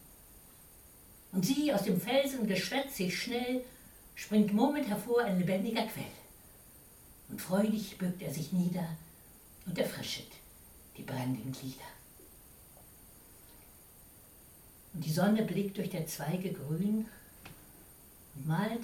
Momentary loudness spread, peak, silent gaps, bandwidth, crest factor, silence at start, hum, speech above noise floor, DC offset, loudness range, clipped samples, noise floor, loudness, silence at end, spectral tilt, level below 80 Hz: 25 LU; -14 dBFS; none; 18.5 kHz; 20 dB; 0 s; none; 24 dB; under 0.1%; 12 LU; under 0.1%; -57 dBFS; -34 LUFS; 0 s; -5.5 dB/octave; -64 dBFS